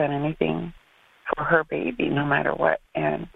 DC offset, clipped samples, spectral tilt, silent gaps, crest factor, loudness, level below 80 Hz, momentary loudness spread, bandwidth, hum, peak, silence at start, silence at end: under 0.1%; under 0.1%; -9 dB/octave; none; 20 dB; -24 LUFS; -50 dBFS; 9 LU; 4.2 kHz; none; -4 dBFS; 0 s; 0.05 s